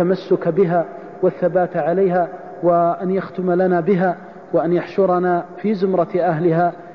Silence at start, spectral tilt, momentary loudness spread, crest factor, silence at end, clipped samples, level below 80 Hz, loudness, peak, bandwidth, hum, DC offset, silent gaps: 0 s; -10 dB/octave; 5 LU; 12 dB; 0 s; under 0.1%; -62 dBFS; -18 LUFS; -6 dBFS; 5.8 kHz; none; 0.2%; none